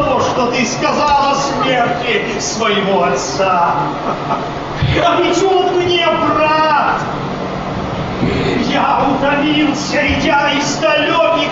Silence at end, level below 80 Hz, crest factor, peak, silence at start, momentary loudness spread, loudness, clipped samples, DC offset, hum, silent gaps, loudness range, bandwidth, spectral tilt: 0 s; -36 dBFS; 12 dB; -2 dBFS; 0 s; 7 LU; -14 LUFS; under 0.1%; under 0.1%; none; none; 2 LU; 8 kHz; -4.5 dB/octave